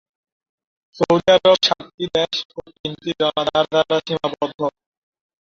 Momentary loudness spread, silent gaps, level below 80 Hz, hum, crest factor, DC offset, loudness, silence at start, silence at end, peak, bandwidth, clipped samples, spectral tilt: 13 LU; 1.94-1.98 s, 2.45-2.49 s, 2.79-2.84 s, 4.54-4.58 s; -56 dBFS; none; 18 dB; under 0.1%; -19 LUFS; 0.95 s; 0.75 s; -2 dBFS; 7.4 kHz; under 0.1%; -4.5 dB/octave